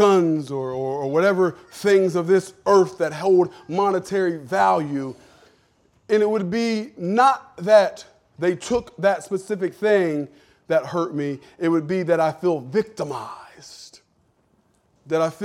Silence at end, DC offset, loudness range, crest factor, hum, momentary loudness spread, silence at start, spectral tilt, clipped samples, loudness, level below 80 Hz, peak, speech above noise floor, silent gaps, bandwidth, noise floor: 0 s; under 0.1%; 5 LU; 18 dB; none; 12 LU; 0 s; -6 dB/octave; under 0.1%; -21 LUFS; -62 dBFS; -4 dBFS; 43 dB; none; 13.5 kHz; -64 dBFS